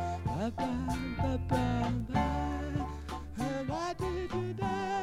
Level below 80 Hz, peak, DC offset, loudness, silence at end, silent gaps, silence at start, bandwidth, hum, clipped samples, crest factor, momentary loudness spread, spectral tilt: -42 dBFS; -16 dBFS; under 0.1%; -34 LUFS; 0 s; none; 0 s; 15 kHz; none; under 0.1%; 16 dB; 5 LU; -7 dB/octave